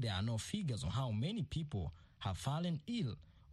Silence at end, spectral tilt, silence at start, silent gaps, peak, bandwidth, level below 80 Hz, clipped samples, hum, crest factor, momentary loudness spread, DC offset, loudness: 0 s; -6 dB/octave; 0 s; none; -24 dBFS; 12.5 kHz; -58 dBFS; under 0.1%; none; 14 dB; 6 LU; under 0.1%; -41 LUFS